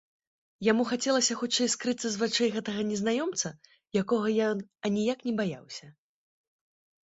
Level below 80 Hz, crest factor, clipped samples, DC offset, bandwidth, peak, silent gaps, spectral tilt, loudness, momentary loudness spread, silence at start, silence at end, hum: -70 dBFS; 20 dB; under 0.1%; under 0.1%; 8.2 kHz; -10 dBFS; none; -3.5 dB/octave; -29 LUFS; 7 LU; 0.6 s; 1.15 s; none